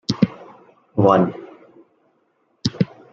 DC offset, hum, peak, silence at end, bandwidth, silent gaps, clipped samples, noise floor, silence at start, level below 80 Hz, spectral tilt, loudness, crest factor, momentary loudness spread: under 0.1%; none; -2 dBFS; 0.3 s; 7.8 kHz; none; under 0.1%; -65 dBFS; 0.1 s; -54 dBFS; -7 dB/octave; -20 LUFS; 20 dB; 17 LU